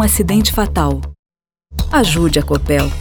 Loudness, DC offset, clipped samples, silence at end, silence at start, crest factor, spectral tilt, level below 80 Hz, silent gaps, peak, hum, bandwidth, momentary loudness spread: -15 LUFS; under 0.1%; under 0.1%; 0 s; 0 s; 14 dB; -4.5 dB/octave; -22 dBFS; 1.19-1.23 s; -2 dBFS; none; over 20 kHz; 11 LU